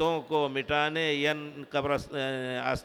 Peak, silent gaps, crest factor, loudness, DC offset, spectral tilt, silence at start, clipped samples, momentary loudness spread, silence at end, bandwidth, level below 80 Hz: -14 dBFS; none; 16 dB; -29 LUFS; under 0.1%; -5 dB/octave; 0 s; under 0.1%; 6 LU; 0 s; 18.5 kHz; -56 dBFS